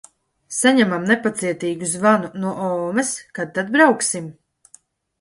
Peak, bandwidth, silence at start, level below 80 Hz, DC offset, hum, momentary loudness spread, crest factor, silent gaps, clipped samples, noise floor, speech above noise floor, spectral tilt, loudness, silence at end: 0 dBFS; 11.5 kHz; 0.5 s; -66 dBFS; under 0.1%; none; 11 LU; 20 dB; none; under 0.1%; -53 dBFS; 34 dB; -4 dB/octave; -19 LUFS; 0.9 s